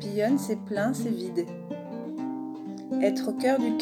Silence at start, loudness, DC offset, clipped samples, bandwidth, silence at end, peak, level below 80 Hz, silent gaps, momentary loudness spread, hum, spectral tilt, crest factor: 0 s; -29 LUFS; under 0.1%; under 0.1%; 17 kHz; 0 s; -12 dBFS; -78 dBFS; none; 11 LU; none; -6 dB/octave; 18 dB